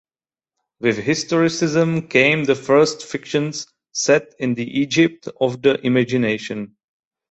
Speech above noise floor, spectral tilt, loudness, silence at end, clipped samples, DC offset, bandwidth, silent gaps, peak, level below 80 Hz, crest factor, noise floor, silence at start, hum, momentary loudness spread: over 72 dB; -5 dB/octave; -19 LUFS; 0.65 s; under 0.1%; under 0.1%; 8.4 kHz; none; -2 dBFS; -60 dBFS; 18 dB; under -90 dBFS; 0.8 s; none; 11 LU